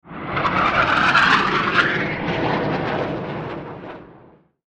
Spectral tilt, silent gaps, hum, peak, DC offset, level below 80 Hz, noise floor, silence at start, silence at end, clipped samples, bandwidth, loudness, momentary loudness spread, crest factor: -5 dB/octave; none; none; 0 dBFS; under 0.1%; -46 dBFS; -50 dBFS; 0.05 s; 0.55 s; under 0.1%; 10 kHz; -19 LUFS; 17 LU; 20 dB